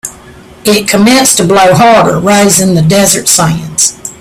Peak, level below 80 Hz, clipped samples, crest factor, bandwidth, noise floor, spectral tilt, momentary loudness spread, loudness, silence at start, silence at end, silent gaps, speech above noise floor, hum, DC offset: 0 dBFS; -38 dBFS; 0.7%; 8 dB; over 20 kHz; -33 dBFS; -3.5 dB/octave; 6 LU; -6 LUFS; 0.05 s; 0.05 s; none; 26 dB; none; under 0.1%